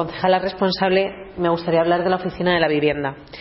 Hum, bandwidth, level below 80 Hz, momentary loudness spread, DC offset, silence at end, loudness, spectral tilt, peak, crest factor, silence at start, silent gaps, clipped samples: none; 5.8 kHz; -48 dBFS; 7 LU; under 0.1%; 0 s; -20 LUFS; -9.5 dB/octave; -2 dBFS; 16 dB; 0 s; none; under 0.1%